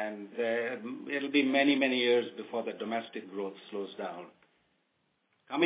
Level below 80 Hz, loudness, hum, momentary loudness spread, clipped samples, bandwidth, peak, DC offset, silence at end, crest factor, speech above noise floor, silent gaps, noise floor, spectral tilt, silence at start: under -90 dBFS; -31 LUFS; none; 14 LU; under 0.1%; 4 kHz; -14 dBFS; under 0.1%; 0 s; 20 dB; 45 dB; none; -76 dBFS; -2 dB/octave; 0 s